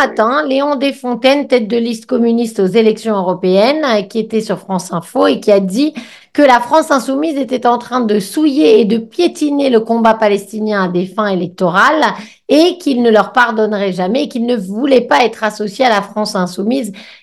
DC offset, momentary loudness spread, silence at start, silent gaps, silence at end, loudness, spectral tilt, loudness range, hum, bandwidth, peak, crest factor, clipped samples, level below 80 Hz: 0.1%; 7 LU; 0 s; none; 0.1 s; -13 LUFS; -5.5 dB/octave; 2 LU; none; 12.5 kHz; 0 dBFS; 12 dB; 0.1%; -60 dBFS